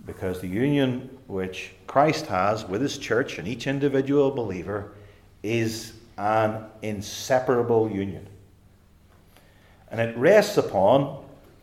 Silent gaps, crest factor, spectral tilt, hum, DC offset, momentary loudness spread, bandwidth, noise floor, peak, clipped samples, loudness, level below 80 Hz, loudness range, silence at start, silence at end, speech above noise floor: none; 20 dB; -6 dB/octave; none; under 0.1%; 14 LU; 16 kHz; -55 dBFS; -6 dBFS; under 0.1%; -24 LUFS; -58 dBFS; 4 LU; 0.05 s; 0.25 s; 31 dB